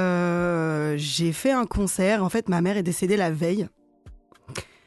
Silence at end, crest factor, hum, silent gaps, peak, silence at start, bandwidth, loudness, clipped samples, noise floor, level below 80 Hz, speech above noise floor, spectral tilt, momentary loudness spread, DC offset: 0.25 s; 14 dB; none; none; -10 dBFS; 0 s; 12.5 kHz; -24 LUFS; under 0.1%; -49 dBFS; -44 dBFS; 26 dB; -5.5 dB/octave; 7 LU; under 0.1%